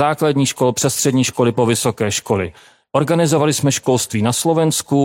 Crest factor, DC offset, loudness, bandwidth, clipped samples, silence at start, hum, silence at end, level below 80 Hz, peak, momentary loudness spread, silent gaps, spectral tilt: 14 dB; under 0.1%; -16 LUFS; 16.5 kHz; under 0.1%; 0 s; none; 0 s; -54 dBFS; -2 dBFS; 5 LU; none; -4.5 dB/octave